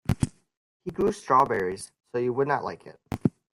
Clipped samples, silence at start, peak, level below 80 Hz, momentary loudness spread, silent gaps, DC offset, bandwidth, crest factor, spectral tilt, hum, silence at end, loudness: under 0.1%; 0.1 s; -8 dBFS; -50 dBFS; 16 LU; 0.57-0.80 s; under 0.1%; 16 kHz; 20 dB; -6.5 dB/octave; none; 0.25 s; -27 LUFS